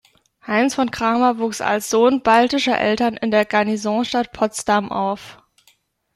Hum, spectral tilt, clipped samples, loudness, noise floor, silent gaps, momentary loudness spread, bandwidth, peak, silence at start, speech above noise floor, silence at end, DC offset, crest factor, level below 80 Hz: none; -4 dB/octave; under 0.1%; -18 LUFS; -60 dBFS; none; 7 LU; 14 kHz; -2 dBFS; 0.45 s; 41 dB; 0.8 s; under 0.1%; 16 dB; -54 dBFS